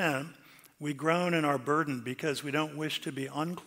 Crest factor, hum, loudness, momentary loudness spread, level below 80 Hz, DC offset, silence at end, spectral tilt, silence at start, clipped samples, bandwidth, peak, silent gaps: 18 dB; none; -32 LUFS; 8 LU; -78 dBFS; under 0.1%; 0 s; -5 dB/octave; 0 s; under 0.1%; 16 kHz; -14 dBFS; none